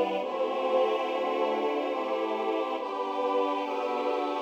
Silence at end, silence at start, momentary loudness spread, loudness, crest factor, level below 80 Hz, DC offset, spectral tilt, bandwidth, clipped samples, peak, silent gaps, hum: 0 s; 0 s; 4 LU; -29 LUFS; 14 dB; -84 dBFS; under 0.1%; -4.5 dB/octave; 8.6 kHz; under 0.1%; -14 dBFS; none; none